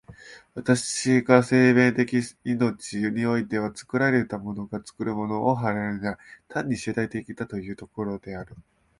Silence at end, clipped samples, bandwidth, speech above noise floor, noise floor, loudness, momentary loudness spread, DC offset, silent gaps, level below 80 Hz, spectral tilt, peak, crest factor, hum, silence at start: 0.4 s; under 0.1%; 11.5 kHz; 23 dB; -47 dBFS; -25 LUFS; 16 LU; under 0.1%; none; -58 dBFS; -5.5 dB/octave; -2 dBFS; 22 dB; none; 0.1 s